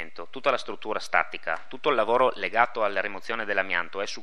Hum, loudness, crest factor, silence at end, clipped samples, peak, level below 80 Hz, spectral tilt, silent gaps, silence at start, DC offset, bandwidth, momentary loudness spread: none; -26 LUFS; 22 dB; 0 s; under 0.1%; -4 dBFS; -74 dBFS; -3.5 dB/octave; none; 0 s; 2%; 12.5 kHz; 9 LU